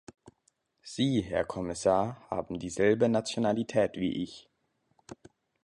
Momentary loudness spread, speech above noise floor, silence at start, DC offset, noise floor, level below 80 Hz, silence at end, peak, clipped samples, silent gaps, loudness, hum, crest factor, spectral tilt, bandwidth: 14 LU; 46 dB; 0.85 s; under 0.1%; -75 dBFS; -58 dBFS; 0.5 s; -12 dBFS; under 0.1%; none; -30 LUFS; none; 18 dB; -5.5 dB/octave; 11 kHz